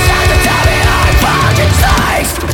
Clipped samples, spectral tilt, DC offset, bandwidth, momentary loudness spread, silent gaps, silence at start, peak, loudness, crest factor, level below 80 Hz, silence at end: under 0.1%; -4 dB/octave; 0.3%; 18 kHz; 1 LU; none; 0 s; 0 dBFS; -10 LUFS; 10 dB; -16 dBFS; 0 s